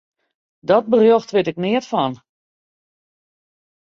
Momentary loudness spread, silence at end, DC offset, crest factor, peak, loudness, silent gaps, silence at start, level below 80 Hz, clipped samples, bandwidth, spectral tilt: 9 LU; 1.8 s; under 0.1%; 18 dB; -2 dBFS; -17 LUFS; none; 0.7 s; -64 dBFS; under 0.1%; 7.2 kHz; -6.5 dB/octave